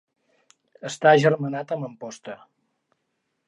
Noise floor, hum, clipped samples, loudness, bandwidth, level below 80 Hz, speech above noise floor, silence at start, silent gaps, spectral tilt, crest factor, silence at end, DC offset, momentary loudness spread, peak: -76 dBFS; none; under 0.1%; -21 LUFS; 11.5 kHz; -76 dBFS; 54 dB; 0.85 s; none; -5.5 dB/octave; 22 dB; 1.1 s; under 0.1%; 22 LU; -4 dBFS